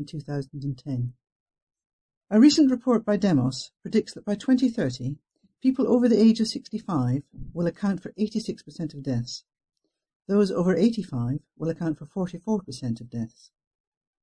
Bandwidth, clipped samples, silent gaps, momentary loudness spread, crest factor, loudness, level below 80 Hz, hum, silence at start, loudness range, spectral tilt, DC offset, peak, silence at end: 10 kHz; under 0.1%; 1.32-1.46 s, 1.62-1.67 s, 1.86-2.09 s, 2.17-2.21 s, 10.16-10.20 s; 15 LU; 20 dB; -25 LUFS; -56 dBFS; none; 0 s; 7 LU; -6.5 dB/octave; under 0.1%; -6 dBFS; 0.95 s